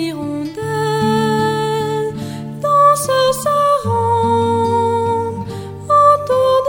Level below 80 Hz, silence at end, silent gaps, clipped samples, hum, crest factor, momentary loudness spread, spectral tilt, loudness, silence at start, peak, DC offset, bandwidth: -50 dBFS; 0 s; none; under 0.1%; none; 14 dB; 12 LU; -5.5 dB/octave; -15 LUFS; 0 s; 0 dBFS; under 0.1%; 16.5 kHz